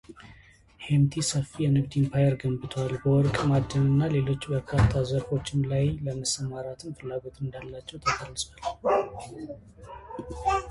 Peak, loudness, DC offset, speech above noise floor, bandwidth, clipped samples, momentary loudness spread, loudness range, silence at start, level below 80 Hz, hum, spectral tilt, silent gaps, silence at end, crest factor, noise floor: -10 dBFS; -27 LUFS; under 0.1%; 28 dB; 11.5 kHz; under 0.1%; 16 LU; 7 LU; 0.1 s; -44 dBFS; none; -6 dB/octave; none; 0 s; 18 dB; -54 dBFS